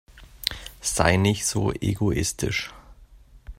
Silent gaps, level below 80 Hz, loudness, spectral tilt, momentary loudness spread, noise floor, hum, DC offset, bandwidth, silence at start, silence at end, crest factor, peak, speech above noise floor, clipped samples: none; -42 dBFS; -24 LUFS; -4 dB/octave; 10 LU; -50 dBFS; none; under 0.1%; 16 kHz; 0.15 s; 0.05 s; 26 dB; 0 dBFS; 27 dB; under 0.1%